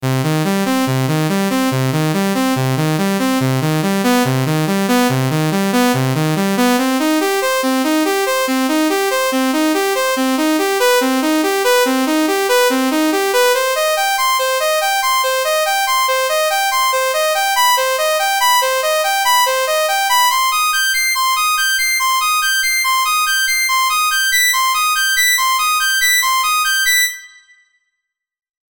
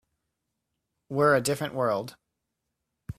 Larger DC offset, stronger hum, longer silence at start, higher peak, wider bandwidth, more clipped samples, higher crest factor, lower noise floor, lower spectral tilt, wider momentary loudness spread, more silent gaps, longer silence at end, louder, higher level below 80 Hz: neither; neither; second, 0 s vs 1.1 s; first, -4 dBFS vs -10 dBFS; first, over 20 kHz vs 16 kHz; neither; second, 12 dB vs 20 dB; about the same, -82 dBFS vs -83 dBFS; second, -3.5 dB/octave vs -5 dB/octave; second, 4 LU vs 11 LU; neither; first, 1.5 s vs 0.05 s; first, -14 LUFS vs -26 LUFS; about the same, -60 dBFS vs -62 dBFS